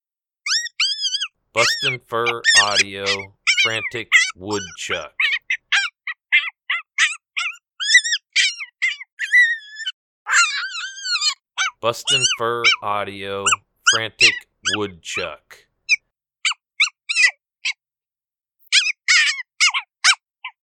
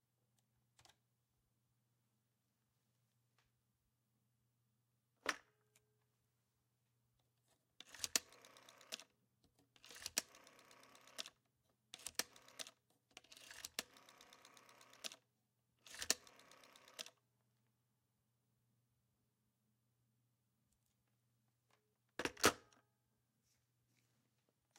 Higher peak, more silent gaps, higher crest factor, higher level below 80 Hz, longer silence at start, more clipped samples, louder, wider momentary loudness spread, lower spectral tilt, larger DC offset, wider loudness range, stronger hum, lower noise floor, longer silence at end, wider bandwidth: first, 0 dBFS vs -12 dBFS; first, 9.12-9.17 s, 9.93-10.26 s vs none; second, 20 dB vs 40 dB; first, -66 dBFS vs -82 dBFS; second, 0.45 s vs 5.25 s; neither; first, -18 LUFS vs -45 LUFS; second, 12 LU vs 23 LU; about the same, 0 dB/octave vs -0.5 dB/octave; neither; second, 3 LU vs 9 LU; neither; first, under -90 dBFS vs -86 dBFS; second, 0.2 s vs 2.2 s; first, 18.5 kHz vs 16 kHz